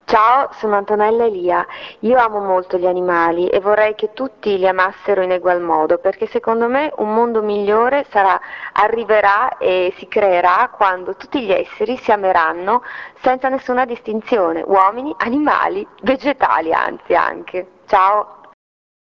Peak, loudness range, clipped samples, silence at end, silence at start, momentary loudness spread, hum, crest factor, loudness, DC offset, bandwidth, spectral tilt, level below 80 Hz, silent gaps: 0 dBFS; 2 LU; under 0.1%; 0.85 s; 0.1 s; 7 LU; none; 16 dB; -16 LUFS; under 0.1%; 6.8 kHz; -6.5 dB/octave; -54 dBFS; none